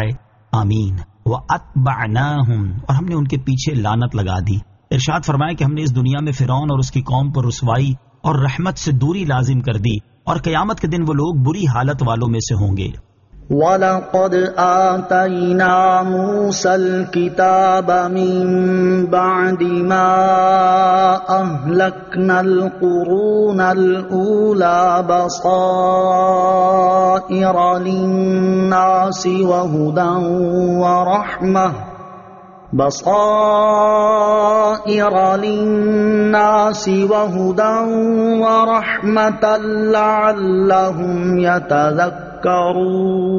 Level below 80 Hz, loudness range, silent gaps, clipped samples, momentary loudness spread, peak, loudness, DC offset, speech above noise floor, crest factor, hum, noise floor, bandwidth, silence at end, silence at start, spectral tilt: -42 dBFS; 4 LU; none; under 0.1%; 6 LU; -2 dBFS; -15 LUFS; under 0.1%; 24 dB; 12 dB; none; -39 dBFS; 7.2 kHz; 0 s; 0 s; -6 dB/octave